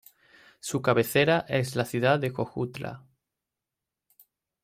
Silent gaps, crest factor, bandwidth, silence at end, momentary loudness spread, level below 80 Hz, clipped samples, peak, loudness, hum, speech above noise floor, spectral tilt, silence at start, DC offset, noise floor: none; 20 dB; 16 kHz; 1.65 s; 16 LU; -64 dBFS; under 0.1%; -10 dBFS; -26 LUFS; none; 62 dB; -5.5 dB/octave; 0.65 s; under 0.1%; -88 dBFS